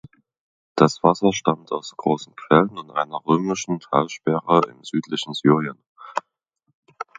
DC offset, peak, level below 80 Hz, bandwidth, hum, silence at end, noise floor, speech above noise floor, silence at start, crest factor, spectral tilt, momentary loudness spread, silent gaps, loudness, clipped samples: under 0.1%; 0 dBFS; -64 dBFS; 9.2 kHz; none; 0.15 s; -73 dBFS; 52 dB; 0.75 s; 22 dB; -5.5 dB/octave; 13 LU; 5.87-5.96 s, 6.74-6.83 s; -21 LUFS; under 0.1%